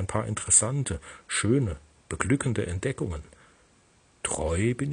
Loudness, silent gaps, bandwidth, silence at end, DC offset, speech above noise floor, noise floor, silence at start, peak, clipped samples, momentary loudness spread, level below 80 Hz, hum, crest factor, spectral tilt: -26 LUFS; none; 10 kHz; 0 s; under 0.1%; 34 dB; -61 dBFS; 0 s; -4 dBFS; under 0.1%; 15 LU; -46 dBFS; none; 24 dB; -4 dB/octave